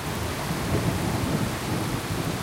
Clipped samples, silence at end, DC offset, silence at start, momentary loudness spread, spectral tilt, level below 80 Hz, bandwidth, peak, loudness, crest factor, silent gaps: under 0.1%; 0 s; under 0.1%; 0 s; 3 LU; -5 dB/octave; -40 dBFS; 17 kHz; -12 dBFS; -27 LUFS; 16 dB; none